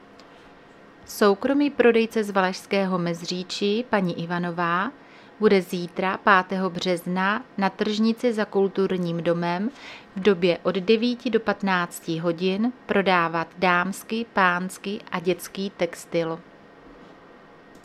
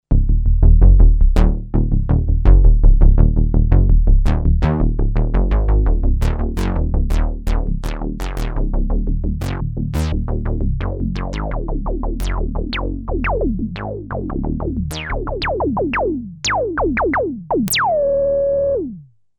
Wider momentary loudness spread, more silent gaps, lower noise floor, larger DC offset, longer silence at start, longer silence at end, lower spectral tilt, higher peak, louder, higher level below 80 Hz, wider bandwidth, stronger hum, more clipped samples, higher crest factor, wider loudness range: about the same, 9 LU vs 10 LU; neither; first, -49 dBFS vs -36 dBFS; neither; about the same, 0.2 s vs 0.1 s; first, 0.7 s vs 0.35 s; about the same, -5.5 dB/octave vs -6.5 dB/octave; about the same, -2 dBFS vs 0 dBFS; second, -24 LUFS vs -19 LUFS; second, -64 dBFS vs -16 dBFS; second, 14.5 kHz vs 16 kHz; neither; neither; first, 22 dB vs 14 dB; second, 2 LU vs 7 LU